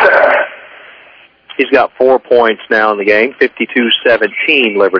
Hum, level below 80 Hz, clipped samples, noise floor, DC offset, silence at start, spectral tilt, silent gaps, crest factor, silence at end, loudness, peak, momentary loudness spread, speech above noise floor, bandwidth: none; -56 dBFS; 0.9%; -42 dBFS; under 0.1%; 0 s; -5.5 dB/octave; none; 12 dB; 0 s; -10 LUFS; 0 dBFS; 5 LU; 31 dB; 5.4 kHz